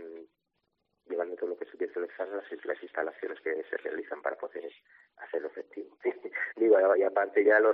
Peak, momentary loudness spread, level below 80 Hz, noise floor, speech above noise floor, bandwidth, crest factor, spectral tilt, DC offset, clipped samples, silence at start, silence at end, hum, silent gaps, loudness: -10 dBFS; 18 LU; -88 dBFS; -81 dBFS; 51 dB; 4.1 kHz; 20 dB; -2 dB/octave; under 0.1%; under 0.1%; 0 s; 0 s; none; none; -31 LUFS